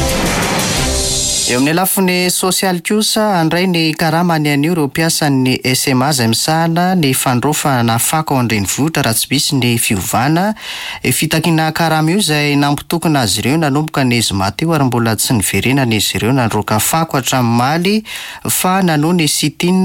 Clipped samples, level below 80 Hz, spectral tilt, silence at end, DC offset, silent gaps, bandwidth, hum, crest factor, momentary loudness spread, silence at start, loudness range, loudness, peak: under 0.1%; -34 dBFS; -4 dB/octave; 0 s; under 0.1%; none; 17 kHz; none; 12 dB; 3 LU; 0 s; 1 LU; -13 LUFS; -2 dBFS